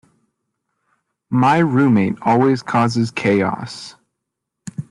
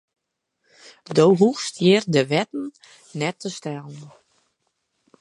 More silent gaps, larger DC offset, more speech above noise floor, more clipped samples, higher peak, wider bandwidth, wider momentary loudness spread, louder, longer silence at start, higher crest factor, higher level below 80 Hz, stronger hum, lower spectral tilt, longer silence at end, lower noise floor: neither; neither; first, 63 dB vs 55 dB; neither; about the same, -4 dBFS vs -4 dBFS; about the same, 11 kHz vs 11.5 kHz; about the same, 18 LU vs 19 LU; first, -17 LUFS vs -21 LUFS; first, 1.3 s vs 1.1 s; about the same, 16 dB vs 20 dB; first, -58 dBFS vs -70 dBFS; neither; first, -7 dB/octave vs -5.5 dB/octave; second, 0.1 s vs 1.15 s; about the same, -79 dBFS vs -76 dBFS